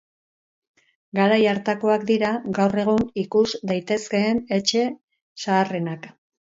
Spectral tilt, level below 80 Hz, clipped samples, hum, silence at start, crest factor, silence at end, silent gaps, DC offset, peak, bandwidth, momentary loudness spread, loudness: -5 dB/octave; -58 dBFS; under 0.1%; none; 1.15 s; 18 dB; 0.45 s; 5.04-5.08 s, 5.22-5.35 s; under 0.1%; -6 dBFS; 7.8 kHz; 9 LU; -22 LUFS